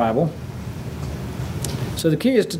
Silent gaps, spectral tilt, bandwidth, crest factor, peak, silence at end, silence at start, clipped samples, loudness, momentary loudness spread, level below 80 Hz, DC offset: none; -6 dB/octave; 16 kHz; 22 dB; 0 dBFS; 0 s; 0 s; under 0.1%; -24 LUFS; 13 LU; -40 dBFS; under 0.1%